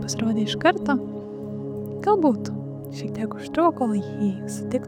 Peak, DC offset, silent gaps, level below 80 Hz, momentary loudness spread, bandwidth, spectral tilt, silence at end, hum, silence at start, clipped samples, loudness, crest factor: -6 dBFS; under 0.1%; none; -58 dBFS; 12 LU; 15.5 kHz; -5.5 dB/octave; 0 s; none; 0 s; under 0.1%; -25 LUFS; 18 dB